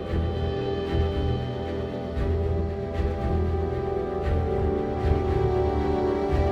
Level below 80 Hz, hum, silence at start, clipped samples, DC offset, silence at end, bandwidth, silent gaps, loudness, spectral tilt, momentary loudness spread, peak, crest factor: -30 dBFS; none; 0 s; under 0.1%; under 0.1%; 0 s; 6.6 kHz; none; -27 LUFS; -9 dB/octave; 5 LU; -10 dBFS; 14 dB